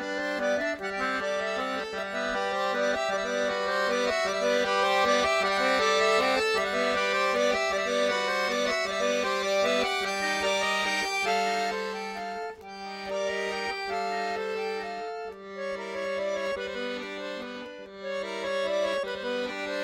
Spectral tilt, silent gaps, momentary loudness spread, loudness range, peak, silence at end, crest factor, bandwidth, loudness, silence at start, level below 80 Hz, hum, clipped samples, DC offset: -2.5 dB/octave; none; 12 LU; 8 LU; -12 dBFS; 0 s; 16 dB; 16 kHz; -28 LUFS; 0 s; -62 dBFS; none; under 0.1%; under 0.1%